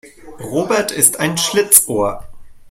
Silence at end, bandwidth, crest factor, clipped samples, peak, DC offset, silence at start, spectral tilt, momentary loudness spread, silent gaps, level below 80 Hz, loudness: 0 s; 16.5 kHz; 16 dB; 0.2%; 0 dBFS; under 0.1%; 0.05 s; -2 dB/octave; 13 LU; none; -46 dBFS; -13 LUFS